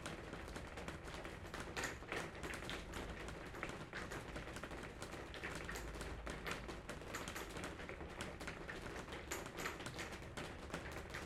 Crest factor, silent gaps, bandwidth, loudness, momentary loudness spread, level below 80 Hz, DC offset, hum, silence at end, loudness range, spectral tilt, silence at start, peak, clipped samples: 24 dB; none; 16 kHz; -48 LUFS; 4 LU; -58 dBFS; under 0.1%; none; 0 s; 1 LU; -4 dB/octave; 0 s; -26 dBFS; under 0.1%